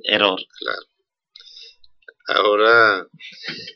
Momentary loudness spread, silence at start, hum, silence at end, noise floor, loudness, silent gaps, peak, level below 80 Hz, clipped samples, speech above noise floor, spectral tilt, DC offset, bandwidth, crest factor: 21 LU; 0.05 s; none; 0.05 s; -52 dBFS; -17 LUFS; none; 0 dBFS; -74 dBFS; under 0.1%; 33 dB; -4 dB/octave; under 0.1%; 6.4 kHz; 20 dB